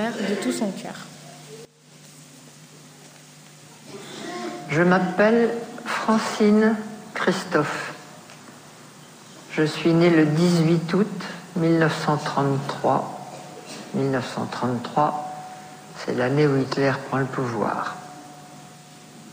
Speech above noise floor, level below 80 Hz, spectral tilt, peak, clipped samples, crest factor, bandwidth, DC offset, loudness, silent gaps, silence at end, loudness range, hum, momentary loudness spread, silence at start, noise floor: 28 dB; -66 dBFS; -6 dB/octave; -6 dBFS; under 0.1%; 18 dB; 15.5 kHz; under 0.1%; -22 LUFS; none; 0 s; 11 LU; none; 24 LU; 0 s; -49 dBFS